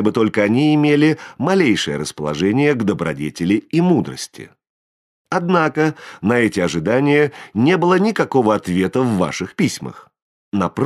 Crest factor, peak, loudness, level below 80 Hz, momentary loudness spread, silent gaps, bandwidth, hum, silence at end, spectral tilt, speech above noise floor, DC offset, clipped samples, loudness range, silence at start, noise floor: 16 dB; -2 dBFS; -17 LUFS; -54 dBFS; 9 LU; 4.70-5.25 s, 10.22-10.52 s; 13 kHz; none; 0 s; -6 dB/octave; over 73 dB; under 0.1%; under 0.1%; 3 LU; 0 s; under -90 dBFS